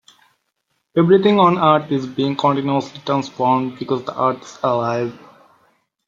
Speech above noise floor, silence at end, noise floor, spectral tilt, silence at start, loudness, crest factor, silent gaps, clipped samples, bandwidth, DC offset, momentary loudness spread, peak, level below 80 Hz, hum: 54 dB; 0.9 s; -71 dBFS; -7 dB/octave; 0.95 s; -18 LUFS; 18 dB; none; under 0.1%; 7.6 kHz; under 0.1%; 10 LU; -2 dBFS; -62 dBFS; none